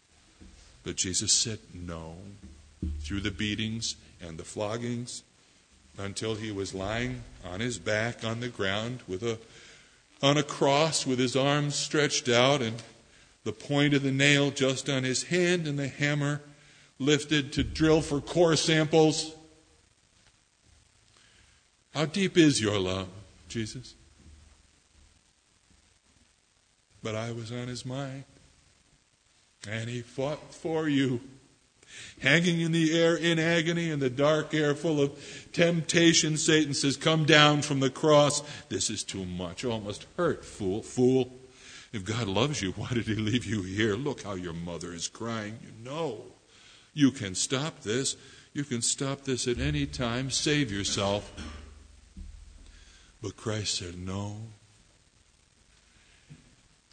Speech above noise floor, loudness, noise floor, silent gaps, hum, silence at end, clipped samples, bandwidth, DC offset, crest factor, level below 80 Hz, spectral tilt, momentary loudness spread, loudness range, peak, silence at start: 40 dB; -28 LUFS; -68 dBFS; none; none; 0.55 s; under 0.1%; 9.6 kHz; under 0.1%; 26 dB; -52 dBFS; -4 dB/octave; 17 LU; 12 LU; -2 dBFS; 0.4 s